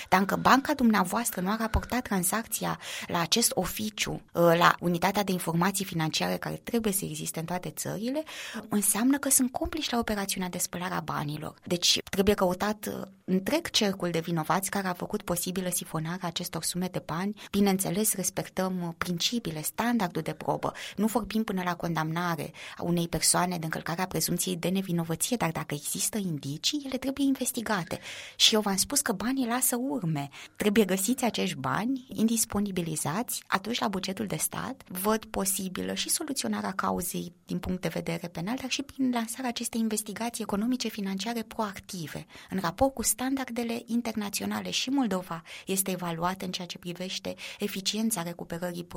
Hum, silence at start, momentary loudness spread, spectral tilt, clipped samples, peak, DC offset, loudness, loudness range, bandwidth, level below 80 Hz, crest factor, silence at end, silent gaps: none; 0 s; 10 LU; -3.5 dB/octave; under 0.1%; -4 dBFS; under 0.1%; -29 LUFS; 5 LU; 16.5 kHz; -52 dBFS; 24 dB; 0 s; none